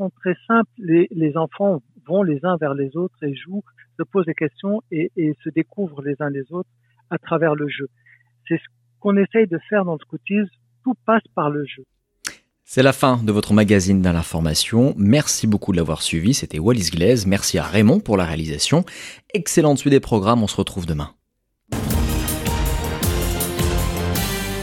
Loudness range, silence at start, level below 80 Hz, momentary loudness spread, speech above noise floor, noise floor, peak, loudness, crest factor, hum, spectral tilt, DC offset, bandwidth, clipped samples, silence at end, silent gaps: 7 LU; 0 s; -34 dBFS; 13 LU; 52 dB; -71 dBFS; -2 dBFS; -20 LUFS; 18 dB; none; -5.5 dB/octave; under 0.1%; 17 kHz; under 0.1%; 0 s; none